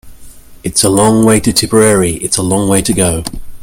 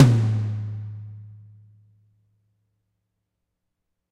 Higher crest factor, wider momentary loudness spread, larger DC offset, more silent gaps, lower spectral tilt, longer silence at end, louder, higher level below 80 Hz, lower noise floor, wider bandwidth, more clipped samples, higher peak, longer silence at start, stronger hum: second, 12 dB vs 24 dB; second, 7 LU vs 23 LU; neither; neither; second, -4 dB/octave vs -7.5 dB/octave; second, 0 s vs 2.75 s; first, -10 LUFS vs -24 LUFS; first, -32 dBFS vs -58 dBFS; second, -33 dBFS vs -79 dBFS; first, over 20 kHz vs 10 kHz; first, 0.2% vs under 0.1%; about the same, 0 dBFS vs -2 dBFS; about the same, 0.05 s vs 0 s; neither